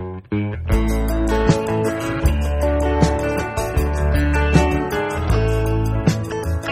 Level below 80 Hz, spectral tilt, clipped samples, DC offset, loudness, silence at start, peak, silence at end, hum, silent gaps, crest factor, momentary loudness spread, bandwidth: -22 dBFS; -6.5 dB/octave; under 0.1%; under 0.1%; -20 LUFS; 0 s; 0 dBFS; 0 s; none; none; 18 dB; 6 LU; 15.5 kHz